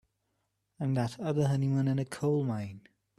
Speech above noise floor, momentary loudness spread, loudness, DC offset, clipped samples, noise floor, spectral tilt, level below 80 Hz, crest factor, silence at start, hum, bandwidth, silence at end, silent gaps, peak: 50 dB; 8 LU; -31 LUFS; under 0.1%; under 0.1%; -80 dBFS; -8 dB/octave; -66 dBFS; 14 dB; 0.8 s; none; 12.5 kHz; 0.4 s; none; -18 dBFS